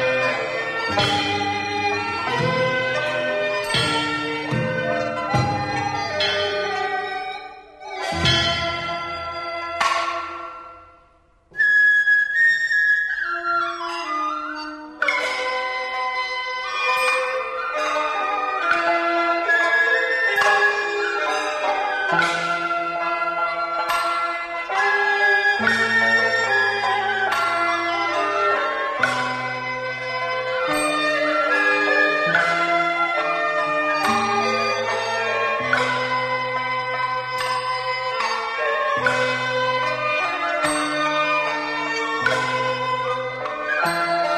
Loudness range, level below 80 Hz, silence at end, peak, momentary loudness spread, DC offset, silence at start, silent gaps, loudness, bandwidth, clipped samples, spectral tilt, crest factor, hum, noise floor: 5 LU; -54 dBFS; 0 s; -6 dBFS; 8 LU; under 0.1%; 0 s; none; -20 LUFS; 13 kHz; under 0.1%; -3.5 dB/octave; 16 dB; none; -56 dBFS